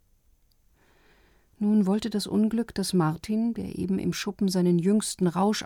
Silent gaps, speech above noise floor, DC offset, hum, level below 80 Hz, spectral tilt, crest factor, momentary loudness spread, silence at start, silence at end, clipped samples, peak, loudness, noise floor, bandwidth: none; 38 dB; under 0.1%; none; -56 dBFS; -6 dB/octave; 14 dB; 6 LU; 1.6 s; 0 s; under 0.1%; -12 dBFS; -26 LUFS; -63 dBFS; 16.5 kHz